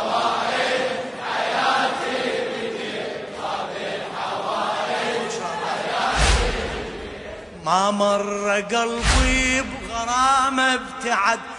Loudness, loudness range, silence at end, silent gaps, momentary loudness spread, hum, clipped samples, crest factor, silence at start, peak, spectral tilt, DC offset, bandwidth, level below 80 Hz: -22 LUFS; 6 LU; 0 s; none; 10 LU; none; under 0.1%; 18 dB; 0 s; -4 dBFS; -3 dB/octave; under 0.1%; 11 kHz; -32 dBFS